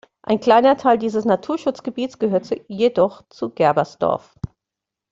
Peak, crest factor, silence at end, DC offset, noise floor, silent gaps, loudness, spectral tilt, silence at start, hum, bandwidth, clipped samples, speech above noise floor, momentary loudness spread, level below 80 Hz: -2 dBFS; 16 dB; 0.65 s; under 0.1%; -85 dBFS; none; -19 LUFS; -6.5 dB/octave; 0.25 s; none; 7.8 kHz; under 0.1%; 66 dB; 15 LU; -54 dBFS